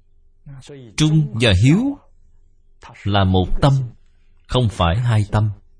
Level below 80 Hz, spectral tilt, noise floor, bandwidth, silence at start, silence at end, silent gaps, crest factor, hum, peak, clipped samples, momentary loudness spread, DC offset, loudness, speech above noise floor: -32 dBFS; -6.5 dB/octave; -50 dBFS; 10.5 kHz; 0.45 s; 0.25 s; none; 18 dB; none; -2 dBFS; under 0.1%; 15 LU; under 0.1%; -18 LUFS; 33 dB